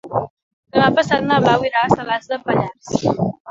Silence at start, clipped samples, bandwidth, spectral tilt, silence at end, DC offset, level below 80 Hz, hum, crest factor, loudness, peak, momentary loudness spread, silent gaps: 0.05 s; under 0.1%; 7.8 kHz; -6 dB/octave; 0 s; under 0.1%; -50 dBFS; none; 18 dB; -18 LUFS; 0 dBFS; 8 LU; 0.30-0.63 s, 3.40-3.45 s